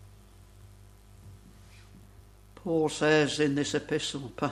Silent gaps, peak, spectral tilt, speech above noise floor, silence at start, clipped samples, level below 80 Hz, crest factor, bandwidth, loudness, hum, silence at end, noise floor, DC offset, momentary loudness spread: none; -10 dBFS; -4.5 dB/octave; 26 dB; 0 s; under 0.1%; -56 dBFS; 22 dB; 13 kHz; -28 LUFS; 50 Hz at -55 dBFS; 0 s; -54 dBFS; under 0.1%; 9 LU